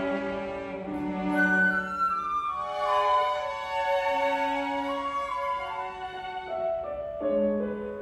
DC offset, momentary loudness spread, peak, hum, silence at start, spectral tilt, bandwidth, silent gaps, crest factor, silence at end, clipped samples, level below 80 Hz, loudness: under 0.1%; 11 LU; -14 dBFS; none; 0 s; -5.5 dB/octave; 12.5 kHz; none; 16 dB; 0 s; under 0.1%; -56 dBFS; -28 LUFS